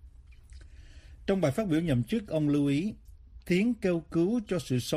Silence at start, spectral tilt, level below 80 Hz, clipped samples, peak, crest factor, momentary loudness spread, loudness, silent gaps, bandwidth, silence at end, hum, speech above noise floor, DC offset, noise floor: 0.05 s; -7 dB/octave; -52 dBFS; under 0.1%; -14 dBFS; 16 dB; 5 LU; -29 LUFS; none; 15.5 kHz; 0 s; none; 24 dB; under 0.1%; -52 dBFS